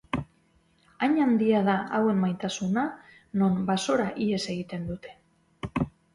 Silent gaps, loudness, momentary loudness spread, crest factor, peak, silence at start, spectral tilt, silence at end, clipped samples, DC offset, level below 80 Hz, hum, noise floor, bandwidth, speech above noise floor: none; -27 LUFS; 12 LU; 16 dB; -12 dBFS; 0.15 s; -6 dB/octave; 0.25 s; under 0.1%; under 0.1%; -54 dBFS; none; -65 dBFS; 11.5 kHz; 39 dB